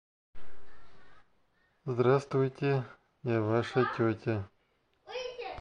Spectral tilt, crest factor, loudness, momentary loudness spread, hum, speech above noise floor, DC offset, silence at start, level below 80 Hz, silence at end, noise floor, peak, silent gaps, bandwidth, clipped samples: -8 dB/octave; 18 dB; -31 LUFS; 15 LU; none; 43 dB; under 0.1%; 0.35 s; -66 dBFS; 0 s; -73 dBFS; -14 dBFS; none; 9.6 kHz; under 0.1%